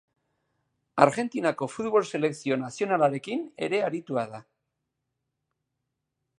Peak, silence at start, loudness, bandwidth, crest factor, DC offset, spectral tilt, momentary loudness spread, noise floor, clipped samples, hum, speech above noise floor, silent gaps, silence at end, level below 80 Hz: -2 dBFS; 0.95 s; -27 LUFS; 11.5 kHz; 28 dB; under 0.1%; -5.5 dB/octave; 10 LU; -82 dBFS; under 0.1%; none; 56 dB; none; 2 s; -74 dBFS